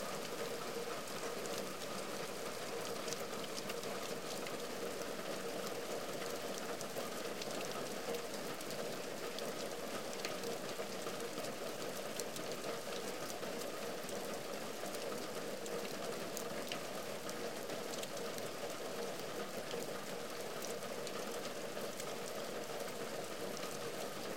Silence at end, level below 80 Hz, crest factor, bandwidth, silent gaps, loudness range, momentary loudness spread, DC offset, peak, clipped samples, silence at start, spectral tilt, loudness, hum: 0 s; -80 dBFS; 26 dB; 17 kHz; none; 1 LU; 2 LU; 0.3%; -18 dBFS; under 0.1%; 0 s; -2.5 dB/octave; -43 LUFS; none